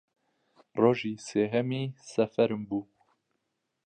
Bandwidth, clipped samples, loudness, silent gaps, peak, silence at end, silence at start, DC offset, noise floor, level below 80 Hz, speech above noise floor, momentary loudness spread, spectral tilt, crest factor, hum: 9.4 kHz; under 0.1%; -29 LUFS; none; -10 dBFS; 1.05 s; 0.75 s; under 0.1%; -81 dBFS; -72 dBFS; 52 dB; 10 LU; -6.5 dB/octave; 20 dB; none